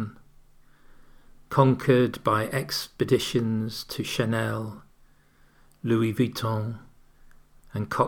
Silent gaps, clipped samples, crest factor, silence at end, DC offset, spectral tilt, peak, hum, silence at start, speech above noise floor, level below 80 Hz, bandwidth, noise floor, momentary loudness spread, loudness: none; under 0.1%; 22 dB; 0 s; under 0.1%; -6 dB/octave; -6 dBFS; none; 0 s; 33 dB; -56 dBFS; over 20 kHz; -58 dBFS; 14 LU; -26 LUFS